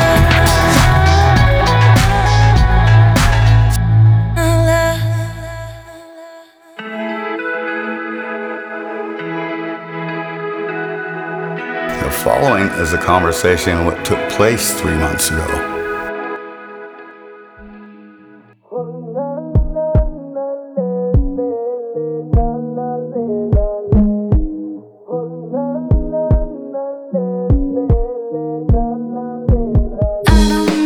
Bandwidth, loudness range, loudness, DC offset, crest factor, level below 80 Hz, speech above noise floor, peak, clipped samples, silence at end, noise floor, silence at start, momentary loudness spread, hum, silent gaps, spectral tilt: over 20 kHz; 12 LU; -16 LUFS; under 0.1%; 14 dB; -22 dBFS; 29 dB; 0 dBFS; under 0.1%; 0 s; -44 dBFS; 0 s; 14 LU; none; none; -5.5 dB/octave